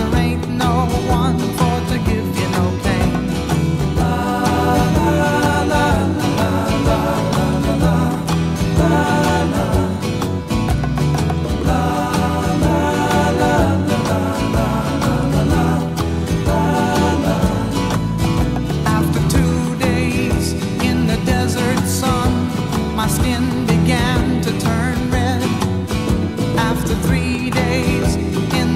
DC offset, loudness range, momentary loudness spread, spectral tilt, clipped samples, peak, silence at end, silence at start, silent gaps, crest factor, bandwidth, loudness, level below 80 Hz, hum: 0.4%; 2 LU; 4 LU; -6 dB/octave; under 0.1%; -2 dBFS; 0 s; 0 s; none; 14 dB; 16 kHz; -17 LUFS; -28 dBFS; none